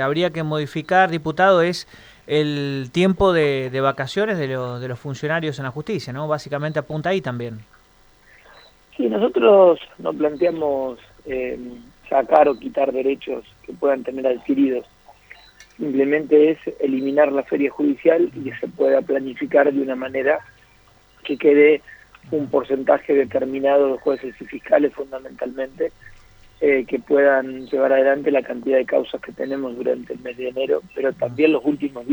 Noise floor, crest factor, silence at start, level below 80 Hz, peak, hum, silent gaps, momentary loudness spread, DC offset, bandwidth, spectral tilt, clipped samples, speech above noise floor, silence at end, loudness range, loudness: -53 dBFS; 20 dB; 0 s; -52 dBFS; 0 dBFS; none; none; 13 LU; under 0.1%; over 20 kHz; -7 dB/octave; under 0.1%; 34 dB; 0 s; 5 LU; -20 LUFS